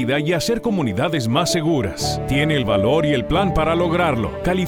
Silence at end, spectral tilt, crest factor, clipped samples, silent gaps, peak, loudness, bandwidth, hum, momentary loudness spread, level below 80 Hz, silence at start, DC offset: 0 s; -5.5 dB/octave; 14 dB; under 0.1%; none; -4 dBFS; -19 LUFS; 18 kHz; none; 3 LU; -36 dBFS; 0 s; under 0.1%